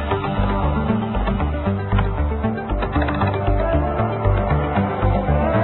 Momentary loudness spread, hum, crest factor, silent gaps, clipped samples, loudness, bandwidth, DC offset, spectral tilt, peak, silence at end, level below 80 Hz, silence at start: 3 LU; none; 14 dB; none; under 0.1%; -21 LUFS; 4.2 kHz; under 0.1%; -12.5 dB/octave; -4 dBFS; 0 s; -24 dBFS; 0 s